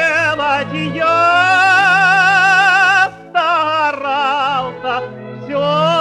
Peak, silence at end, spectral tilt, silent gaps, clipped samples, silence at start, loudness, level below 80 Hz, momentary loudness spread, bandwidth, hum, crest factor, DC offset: -2 dBFS; 0 s; -3.5 dB/octave; none; under 0.1%; 0 s; -13 LUFS; -54 dBFS; 11 LU; 12 kHz; none; 12 dB; under 0.1%